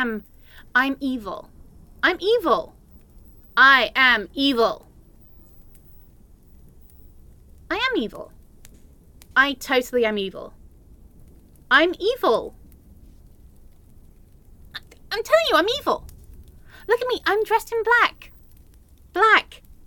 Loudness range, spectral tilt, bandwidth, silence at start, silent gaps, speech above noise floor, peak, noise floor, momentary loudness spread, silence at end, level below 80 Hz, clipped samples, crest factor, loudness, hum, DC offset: 12 LU; -3 dB/octave; 17.5 kHz; 0 s; none; 30 dB; -2 dBFS; -50 dBFS; 22 LU; 0.45 s; -48 dBFS; under 0.1%; 22 dB; -20 LUFS; none; under 0.1%